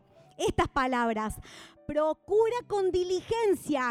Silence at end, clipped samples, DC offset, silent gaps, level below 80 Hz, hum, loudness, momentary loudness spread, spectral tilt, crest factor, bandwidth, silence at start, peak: 0 s; under 0.1%; under 0.1%; none; -50 dBFS; none; -29 LUFS; 9 LU; -5 dB/octave; 16 dB; 15.5 kHz; 0.4 s; -12 dBFS